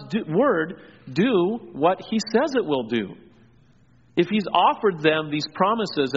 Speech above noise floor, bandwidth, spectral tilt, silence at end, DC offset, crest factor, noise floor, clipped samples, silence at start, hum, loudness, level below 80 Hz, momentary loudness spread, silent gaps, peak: 35 dB; 7.6 kHz; -4 dB/octave; 0 s; under 0.1%; 18 dB; -57 dBFS; under 0.1%; 0 s; none; -22 LUFS; -64 dBFS; 8 LU; none; -4 dBFS